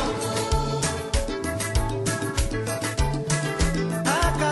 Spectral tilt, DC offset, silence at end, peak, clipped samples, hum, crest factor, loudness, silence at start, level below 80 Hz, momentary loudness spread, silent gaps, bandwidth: -4.5 dB/octave; under 0.1%; 0 s; -10 dBFS; under 0.1%; none; 16 dB; -25 LUFS; 0 s; -30 dBFS; 5 LU; none; 12.5 kHz